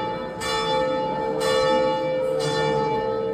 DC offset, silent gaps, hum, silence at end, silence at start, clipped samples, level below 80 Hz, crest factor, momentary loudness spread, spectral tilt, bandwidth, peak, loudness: under 0.1%; none; none; 0 s; 0 s; under 0.1%; -50 dBFS; 12 dB; 5 LU; -4.5 dB/octave; 15 kHz; -10 dBFS; -23 LUFS